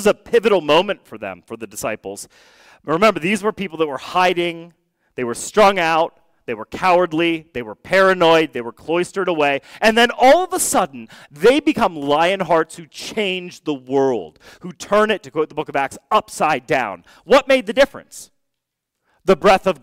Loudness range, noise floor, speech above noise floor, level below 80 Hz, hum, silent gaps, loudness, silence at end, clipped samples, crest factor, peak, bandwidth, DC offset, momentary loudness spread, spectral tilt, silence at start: 5 LU; -78 dBFS; 60 dB; -50 dBFS; none; none; -17 LUFS; 0.1 s; under 0.1%; 14 dB; -4 dBFS; 16 kHz; under 0.1%; 17 LU; -4 dB/octave; 0 s